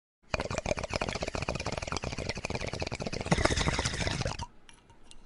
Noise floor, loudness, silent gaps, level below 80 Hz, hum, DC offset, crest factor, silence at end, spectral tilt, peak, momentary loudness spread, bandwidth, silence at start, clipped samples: -54 dBFS; -33 LUFS; none; -42 dBFS; none; under 0.1%; 28 dB; 0 s; -4 dB/octave; -6 dBFS; 8 LU; 11.5 kHz; 0.3 s; under 0.1%